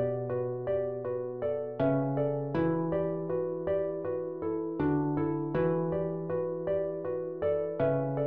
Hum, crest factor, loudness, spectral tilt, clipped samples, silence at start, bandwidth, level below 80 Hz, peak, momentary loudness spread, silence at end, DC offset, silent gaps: none; 14 dB; -31 LUFS; -9 dB/octave; under 0.1%; 0 s; 4.8 kHz; -60 dBFS; -16 dBFS; 5 LU; 0 s; 0.1%; none